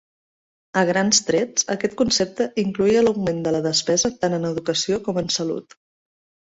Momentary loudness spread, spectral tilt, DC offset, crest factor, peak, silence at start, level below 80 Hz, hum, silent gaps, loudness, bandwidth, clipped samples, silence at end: 6 LU; -3.5 dB/octave; under 0.1%; 18 dB; -4 dBFS; 0.75 s; -54 dBFS; none; none; -21 LUFS; 8 kHz; under 0.1%; 0.85 s